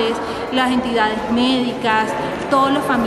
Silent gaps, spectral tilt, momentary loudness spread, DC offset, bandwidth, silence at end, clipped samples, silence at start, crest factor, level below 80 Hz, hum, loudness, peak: none; -4.5 dB/octave; 5 LU; under 0.1%; 13 kHz; 0 s; under 0.1%; 0 s; 14 dB; -46 dBFS; none; -18 LUFS; -4 dBFS